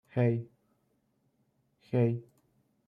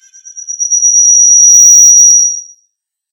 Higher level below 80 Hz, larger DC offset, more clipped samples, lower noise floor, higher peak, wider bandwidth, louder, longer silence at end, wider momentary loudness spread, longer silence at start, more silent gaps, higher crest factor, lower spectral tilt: first, -74 dBFS vs -80 dBFS; neither; second, under 0.1% vs 4%; first, -75 dBFS vs -64 dBFS; second, -16 dBFS vs 0 dBFS; second, 4.5 kHz vs over 20 kHz; second, -31 LUFS vs -2 LUFS; about the same, 0.65 s vs 0.7 s; second, 11 LU vs 15 LU; second, 0.15 s vs 0.35 s; neither; first, 18 dB vs 8 dB; first, -10.5 dB/octave vs 9 dB/octave